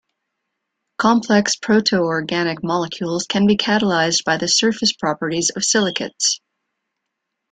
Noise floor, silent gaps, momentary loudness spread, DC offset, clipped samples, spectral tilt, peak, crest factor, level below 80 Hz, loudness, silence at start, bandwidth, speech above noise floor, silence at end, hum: -78 dBFS; none; 6 LU; under 0.1%; under 0.1%; -3 dB/octave; -2 dBFS; 18 dB; -58 dBFS; -18 LUFS; 1 s; 9.4 kHz; 60 dB; 1.15 s; none